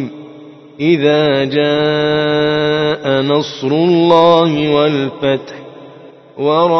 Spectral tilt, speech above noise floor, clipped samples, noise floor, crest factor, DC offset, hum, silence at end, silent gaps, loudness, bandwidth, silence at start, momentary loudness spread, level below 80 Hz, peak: -6.5 dB/octave; 26 dB; under 0.1%; -38 dBFS; 14 dB; under 0.1%; none; 0 s; none; -13 LUFS; 6.2 kHz; 0 s; 10 LU; -52 dBFS; 0 dBFS